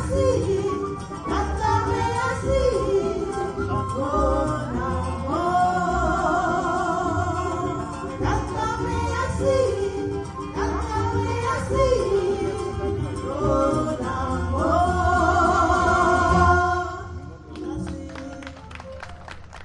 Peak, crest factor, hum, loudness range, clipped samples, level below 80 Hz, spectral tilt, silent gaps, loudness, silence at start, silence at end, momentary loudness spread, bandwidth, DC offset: -4 dBFS; 18 dB; none; 5 LU; under 0.1%; -36 dBFS; -6.5 dB/octave; none; -23 LUFS; 0 s; 0 s; 14 LU; 11.5 kHz; under 0.1%